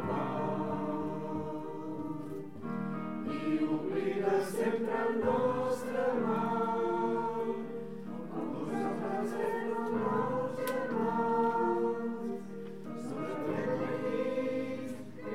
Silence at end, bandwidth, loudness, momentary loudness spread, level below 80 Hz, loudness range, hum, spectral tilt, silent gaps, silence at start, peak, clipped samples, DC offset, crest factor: 0 s; 16 kHz; -34 LUFS; 10 LU; -72 dBFS; 5 LU; none; -7 dB/octave; none; 0 s; -18 dBFS; under 0.1%; 0.4%; 16 dB